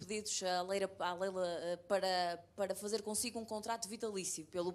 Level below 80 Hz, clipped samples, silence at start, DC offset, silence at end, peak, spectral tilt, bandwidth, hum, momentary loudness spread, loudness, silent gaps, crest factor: -76 dBFS; under 0.1%; 0 s; under 0.1%; 0 s; -22 dBFS; -2.5 dB/octave; 15 kHz; none; 5 LU; -39 LUFS; none; 18 dB